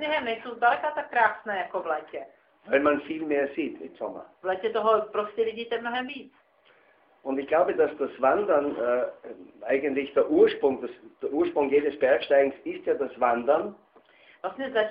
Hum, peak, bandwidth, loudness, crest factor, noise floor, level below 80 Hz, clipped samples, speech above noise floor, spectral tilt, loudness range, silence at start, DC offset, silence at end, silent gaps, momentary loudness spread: none; -8 dBFS; 5.2 kHz; -26 LUFS; 18 dB; -61 dBFS; -68 dBFS; under 0.1%; 35 dB; -2 dB/octave; 5 LU; 0 s; under 0.1%; 0 s; none; 14 LU